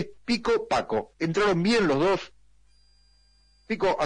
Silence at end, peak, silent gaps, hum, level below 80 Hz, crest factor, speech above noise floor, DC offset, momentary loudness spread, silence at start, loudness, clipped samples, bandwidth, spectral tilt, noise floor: 0 s; -16 dBFS; none; 50 Hz at -60 dBFS; -54 dBFS; 12 dB; 38 dB; under 0.1%; 8 LU; 0 s; -25 LUFS; under 0.1%; 10.5 kHz; -5.5 dB/octave; -62 dBFS